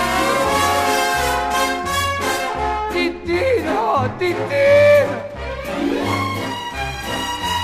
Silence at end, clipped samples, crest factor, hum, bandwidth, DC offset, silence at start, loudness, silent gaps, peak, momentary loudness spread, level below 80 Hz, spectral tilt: 0 s; under 0.1%; 14 dB; none; 15.5 kHz; under 0.1%; 0 s; -18 LUFS; none; -4 dBFS; 11 LU; -38 dBFS; -4 dB/octave